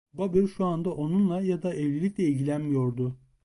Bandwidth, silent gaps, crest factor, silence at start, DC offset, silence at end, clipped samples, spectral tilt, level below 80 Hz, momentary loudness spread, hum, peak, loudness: 11.5 kHz; none; 16 dB; 0.15 s; under 0.1%; 0.3 s; under 0.1%; -9 dB/octave; -58 dBFS; 4 LU; none; -12 dBFS; -27 LUFS